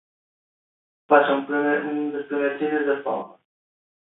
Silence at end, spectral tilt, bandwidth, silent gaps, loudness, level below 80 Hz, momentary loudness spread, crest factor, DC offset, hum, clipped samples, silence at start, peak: 0.9 s; -9.5 dB/octave; 4 kHz; none; -23 LUFS; -76 dBFS; 11 LU; 22 dB; under 0.1%; none; under 0.1%; 1.1 s; -2 dBFS